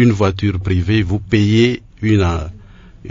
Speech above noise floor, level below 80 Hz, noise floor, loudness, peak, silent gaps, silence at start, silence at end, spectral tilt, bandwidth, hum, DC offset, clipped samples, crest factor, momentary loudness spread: 24 dB; -36 dBFS; -38 dBFS; -16 LUFS; 0 dBFS; none; 0 s; 0 s; -7 dB/octave; 7.6 kHz; none; under 0.1%; under 0.1%; 16 dB; 7 LU